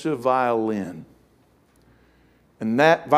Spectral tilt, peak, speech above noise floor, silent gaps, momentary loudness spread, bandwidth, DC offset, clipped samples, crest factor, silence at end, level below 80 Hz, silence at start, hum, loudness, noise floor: -6 dB/octave; -2 dBFS; 39 dB; none; 16 LU; 15 kHz; under 0.1%; under 0.1%; 22 dB; 0 s; -64 dBFS; 0 s; 60 Hz at -65 dBFS; -22 LUFS; -59 dBFS